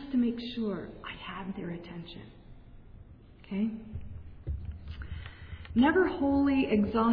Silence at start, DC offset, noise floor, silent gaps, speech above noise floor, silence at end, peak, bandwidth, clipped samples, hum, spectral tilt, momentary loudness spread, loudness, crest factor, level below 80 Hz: 0 s; under 0.1%; -52 dBFS; none; 23 dB; 0 s; -12 dBFS; 5.2 kHz; under 0.1%; none; -9.5 dB/octave; 19 LU; -30 LUFS; 20 dB; -48 dBFS